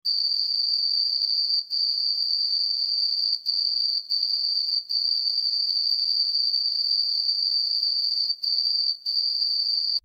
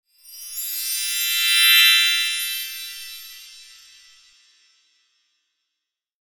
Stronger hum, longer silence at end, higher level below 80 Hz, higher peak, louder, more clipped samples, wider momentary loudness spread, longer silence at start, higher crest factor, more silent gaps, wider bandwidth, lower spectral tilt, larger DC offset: neither; second, 0.05 s vs 2.6 s; about the same, -76 dBFS vs -74 dBFS; second, -12 dBFS vs -2 dBFS; second, -21 LUFS vs -16 LUFS; neither; second, 2 LU vs 25 LU; second, 0.05 s vs 0.3 s; second, 12 dB vs 22 dB; neither; second, 15.5 kHz vs 19 kHz; first, 2 dB/octave vs 8 dB/octave; neither